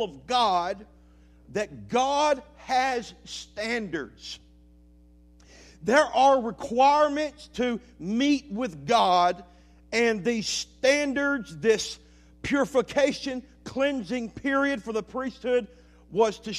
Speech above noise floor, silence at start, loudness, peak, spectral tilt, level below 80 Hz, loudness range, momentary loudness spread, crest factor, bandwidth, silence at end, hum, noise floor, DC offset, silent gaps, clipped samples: 29 dB; 0 s; -26 LUFS; -6 dBFS; -3.5 dB/octave; -56 dBFS; 5 LU; 14 LU; 20 dB; 13.5 kHz; 0 s; none; -55 dBFS; under 0.1%; none; under 0.1%